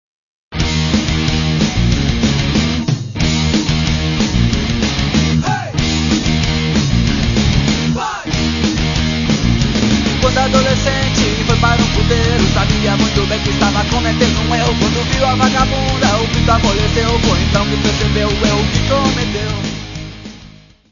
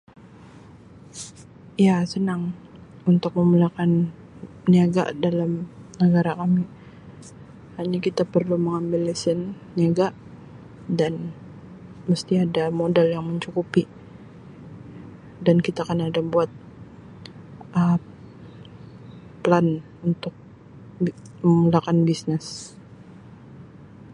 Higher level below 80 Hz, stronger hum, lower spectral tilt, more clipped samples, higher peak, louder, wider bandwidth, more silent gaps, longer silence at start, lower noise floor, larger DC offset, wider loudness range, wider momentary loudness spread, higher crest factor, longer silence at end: first, -22 dBFS vs -58 dBFS; neither; second, -5 dB/octave vs -7.5 dB/octave; neither; about the same, 0 dBFS vs -2 dBFS; first, -14 LUFS vs -22 LUFS; second, 7.4 kHz vs 10.5 kHz; neither; about the same, 0.5 s vs 0.55 s; second, -40 dBFS vs -46 dBFS; neither; second, 2 LU vs 5 LU; second, 5 LU vs 24 LU; second, 14 dB vs 22 dB; first, 0.45 s vs 0.05 s